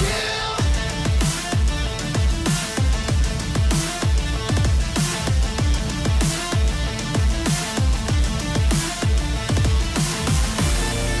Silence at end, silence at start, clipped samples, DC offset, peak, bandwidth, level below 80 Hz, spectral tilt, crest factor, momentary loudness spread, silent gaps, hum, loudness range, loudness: 0 s; 0 s; under 0.1%; under 0.1%; -12 dBFS; 11 kHz; -24 dBFS; -4.5 dB/octave; 8 dB; 2 LU; none; none; 1 LU; -21 LUFS